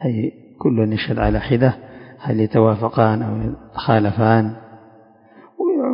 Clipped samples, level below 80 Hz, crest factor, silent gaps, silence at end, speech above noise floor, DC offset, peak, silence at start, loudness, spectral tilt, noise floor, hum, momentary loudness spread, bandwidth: under 0.1%; -36 dBFS; 18 dB; none; 0 s; 31 dB; under 0.1%; 0 dBFS; 0 s; -19 LUFS; -12 dB/octave; -48 dBFS; none; 10 LU; 5.4 kHz